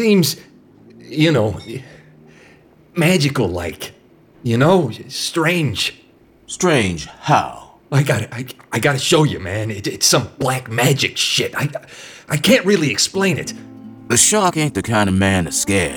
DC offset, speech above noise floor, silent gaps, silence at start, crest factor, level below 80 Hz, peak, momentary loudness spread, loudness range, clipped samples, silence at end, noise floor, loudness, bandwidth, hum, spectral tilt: under 0.1%; 32 dB; none; 0 s; 18 dB; -48 dBFS; 0 dBFS; 16 LU; 4 LU; under 0.1%; 0 s; -49 dBFS; -17 LUFS; 19.5 kHz; none; -4 dB/octave